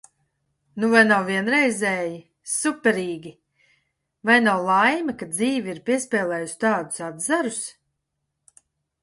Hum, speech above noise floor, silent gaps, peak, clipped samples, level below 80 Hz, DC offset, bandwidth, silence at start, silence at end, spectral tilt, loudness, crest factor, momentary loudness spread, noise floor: none; 57 dB; none; -2 dBFS; under 0.1%; -68 dBFS; under 0.1%; 11.5 kHz; 0.75 s; 1.3 s; -3.5 dB/octave; -21 LUFS; 20 dB; 14 LU; -78 dBFS